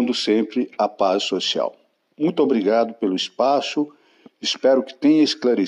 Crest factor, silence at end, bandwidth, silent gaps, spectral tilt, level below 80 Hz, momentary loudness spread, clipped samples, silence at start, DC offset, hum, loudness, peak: 14 dB; 0 s; 11 kHz; none; -4.5 dB/octave; -76 dBFS; 7 LU; under 0.1%; 0 s; under 0.1%; none; -20 LUFS; -6 dBFS